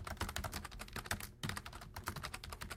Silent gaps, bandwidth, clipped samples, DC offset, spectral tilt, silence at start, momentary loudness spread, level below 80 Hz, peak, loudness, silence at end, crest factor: none; 17 kHz; under 0.1%; under 0.1%; -3.5 dB/octave; 0 s; 6 LU; -54 dBFS; -18 dBFS; -45 LUFS; 0 s; 26 dB